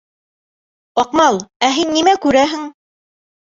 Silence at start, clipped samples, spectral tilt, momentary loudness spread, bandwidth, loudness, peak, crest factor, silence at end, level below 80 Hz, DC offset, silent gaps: 0.95 s; under 0.1%; -3 dB/octave; 9 LU; 8 kHz; -15 LUFS; 0 dBFS; 16 dB; 0.7 s; -52 dBFS; under 0.1%; 1.56-1.60 s